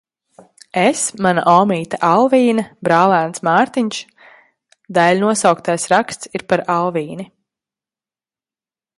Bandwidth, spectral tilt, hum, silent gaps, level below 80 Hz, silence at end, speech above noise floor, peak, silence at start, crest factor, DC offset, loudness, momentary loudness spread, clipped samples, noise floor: 11.5 kHz; -4.5 dB/octave; none; none; -62 dBFS; 1.75 s; over 75 dB; 0 dBFS; 0.75 s; 16 dB; under 0.1%; -15 LUFS; 12 LU; under 0.1%; under -90 dBFS